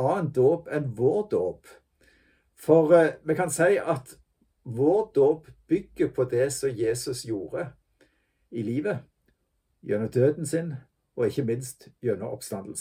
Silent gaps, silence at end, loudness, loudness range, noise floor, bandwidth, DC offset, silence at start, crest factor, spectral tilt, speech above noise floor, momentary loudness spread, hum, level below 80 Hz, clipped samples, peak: none; 0 s; -26 LUFS; 6 LU; -73 dBFS; 16 kHz; under 0.1%; 0 s; 20 dB; -6 dB/octave; 48 dB; 13 LU; none; -62 dBFS; under 0.1%; -6 dBFS